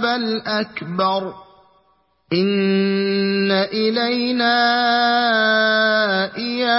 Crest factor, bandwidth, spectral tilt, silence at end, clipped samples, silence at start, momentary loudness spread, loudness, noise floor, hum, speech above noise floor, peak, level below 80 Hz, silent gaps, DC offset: 14 dB; 5.8 kHz; -8.5 dB/octave; 0 s; under 0.1%; 0 s; 7 LU; -18 LUFS; -61 dBFS; none; 43 dB; -4 dBFS; -66 dBFS; none; under 0.1%